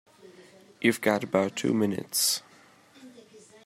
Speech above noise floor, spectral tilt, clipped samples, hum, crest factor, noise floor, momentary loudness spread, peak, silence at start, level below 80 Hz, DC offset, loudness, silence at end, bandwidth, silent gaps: 30 dB; -3.5 dB/octave; under 0.1%; none; 22 dB; -57 dBFS; 3 LU; -8 dBFS; 0.4 s; -74 dBFS; under 0.1%; -26 LUFS; 0.25 s; 16 kHz; none